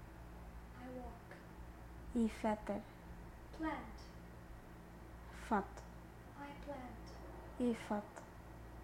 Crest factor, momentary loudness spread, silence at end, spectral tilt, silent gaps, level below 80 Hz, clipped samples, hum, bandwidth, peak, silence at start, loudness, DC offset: 22 dB; 16 LU; 0 s; -6.5 dB/octave; none; -56 dBFS; under 0.1%; none; 16 kHz; -24 dBFS; 0 s; -46 LUFS; under 0.1%